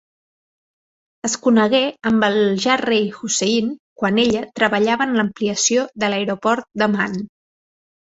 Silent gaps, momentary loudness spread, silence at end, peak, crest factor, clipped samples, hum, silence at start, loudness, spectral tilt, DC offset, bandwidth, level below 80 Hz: 3.79-3.96 s; 7 LU; 0.85 s; -2 dBFS; 18 dB; under 0.1%; none; 1.25 s; -18 LUFS; -3.5 dB/octave; under 0.1%; 8 kHz; -58 dBFS